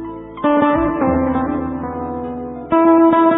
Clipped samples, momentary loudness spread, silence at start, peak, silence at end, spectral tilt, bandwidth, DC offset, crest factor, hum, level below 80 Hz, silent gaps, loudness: under 0.1%; 14 LU; 0 s; -2 dBFS; 0 s; -11.5 dB/octave; 3.9 kHz; under 0.1%; 14 dB; none; -38 dBFS; none; -16 LUFS